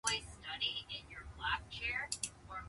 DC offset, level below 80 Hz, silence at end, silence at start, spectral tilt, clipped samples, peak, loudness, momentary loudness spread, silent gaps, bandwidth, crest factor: under 0.1%; -58 dBFS; 0 s; 0.05 s; -0.5 dB/octave; under 0.1%; -18 dBFS; -40 LUFS; 9 LU; none; 11.5 kHz; 24 dB